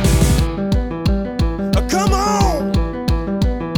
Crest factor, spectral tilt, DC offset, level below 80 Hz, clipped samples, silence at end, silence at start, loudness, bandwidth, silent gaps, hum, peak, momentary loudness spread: 14 dB; -6 dB/octave; under 0.1%; -20 dBFS; under 0.1%; 0 s; 0 s; -18 LUFS; over 20 kHz; none; none; -2 dBFS; 5 LU